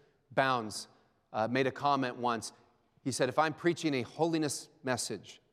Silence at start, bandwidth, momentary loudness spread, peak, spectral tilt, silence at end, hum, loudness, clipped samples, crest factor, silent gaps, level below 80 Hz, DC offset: 0.3 s; 15.5 kHz; 11 LU; -12 dBFS; -4.5 dB/octave; 0.2 s; none; -33 LUFS; under 0.1%; 22 dB; none; -80 dBFS; under 0.1%